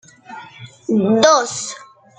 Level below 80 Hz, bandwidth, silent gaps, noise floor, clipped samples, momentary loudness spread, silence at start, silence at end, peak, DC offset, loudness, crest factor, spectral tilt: -62 dBFS; 9.4 kHz; none; -39 dBFS; under 0.1%; 24 LU; 0.3 s; 0.35 s; -2 dBFS; under 0.1%; -15 LUFS; 18 dB; -3.5 dB/octave